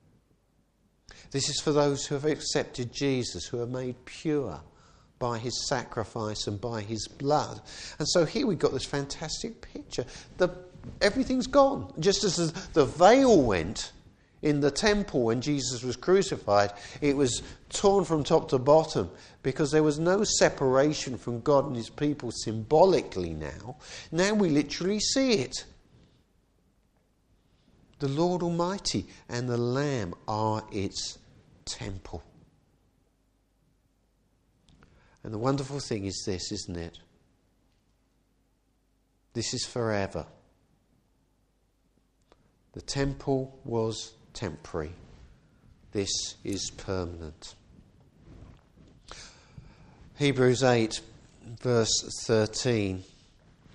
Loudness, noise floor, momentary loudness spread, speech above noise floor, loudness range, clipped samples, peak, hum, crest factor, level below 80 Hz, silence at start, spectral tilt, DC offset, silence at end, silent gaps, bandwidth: -28 LUFS; -70 dBFS; 16 LU; 43 dB; 13 LU; under 0.1%; -4 dBFS; none; 24 dB; -52 dBFS; 1.1 s; -4.5 dB/octave; under 0.1%; 0.7 s; none; 11 kHz